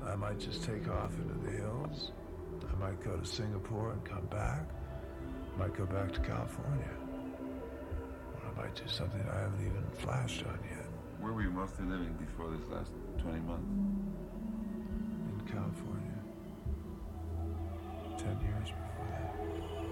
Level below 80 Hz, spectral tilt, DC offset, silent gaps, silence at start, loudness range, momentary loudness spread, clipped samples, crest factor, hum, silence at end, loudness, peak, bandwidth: -46 dBFS; -6.5 dB/octave; under 0.1%; none; 0 s; 3 LU; 7 LU; under 0.1%; 18 dB; none; 0 s; -40 LUFS; -22 dBFS; 16.5 kHz